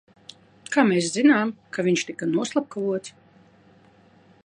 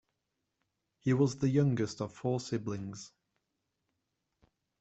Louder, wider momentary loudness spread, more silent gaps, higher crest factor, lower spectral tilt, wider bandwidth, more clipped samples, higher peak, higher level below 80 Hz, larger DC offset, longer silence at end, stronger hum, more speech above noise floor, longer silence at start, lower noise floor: first, -23 LUFS vs -33 LUFS; second, 9 LU vs 15 LU; neither; about the same, 22 dB vs 20 dB; second, -4.5 dB/octave vs -7 dB/octave; first, 10.5 kHz vs 8.2 kHz; neither; first, -4 dBFS vs -16 dBFS; about the same, -72 dBFS vs -70 dBFS; neither; second, 1.35 s vs 1.75 s; neither; second, 33 dB vs 53 dB; second, 0.7 s vs 1.05 s; second, -55 dBFS vs -85 dBFS